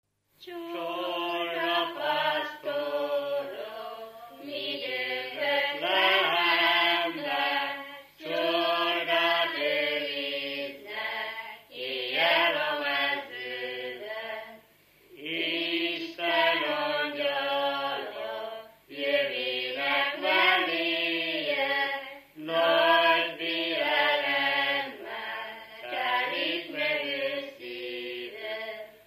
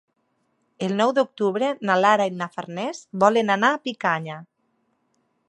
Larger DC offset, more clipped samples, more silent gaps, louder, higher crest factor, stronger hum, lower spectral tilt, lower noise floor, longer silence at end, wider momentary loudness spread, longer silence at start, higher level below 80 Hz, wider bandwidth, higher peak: neither; neither; neither; second, -27 LUFS vs -22 LUFS; about the same, 20 dB vs 20 dB; first, 50 Hz at -75 dBFS vs none; second, -3.5 dB/octave vs -5 dB/octave; second, -60 dBFS vs -70 dBFS; second, 0.1 s vs 1.05 s; first, 15 LU vs 12 LU; second, 0.4 s vs 0.8 s; second, -80 dBFS vs -74 dBFS; first, 15 kHz vs 11 kHz; second, -10 dBFS vs -2 dBFS